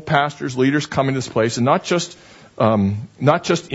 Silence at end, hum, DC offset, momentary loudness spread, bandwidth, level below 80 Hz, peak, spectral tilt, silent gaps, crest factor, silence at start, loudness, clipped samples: 0 s; none; under 0.1%; 5 LU; 8 kHz; -54 dBFS; 0 dBFS; -5.5 dB/octave; none; 18 dB; 0 s; -19 LUFS; under 0.1%